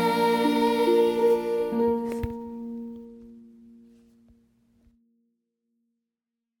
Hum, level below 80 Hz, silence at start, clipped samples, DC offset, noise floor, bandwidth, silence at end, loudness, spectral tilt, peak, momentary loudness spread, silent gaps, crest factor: none; -54 dBFS; 0 s; under 0.1%; under 0.1%; -87 dBFS; 17.5 kHz; 3.15 s; -24 LUFS; -5.5 dB/octave; -10 dBFS; 17 LU; none; 16 dB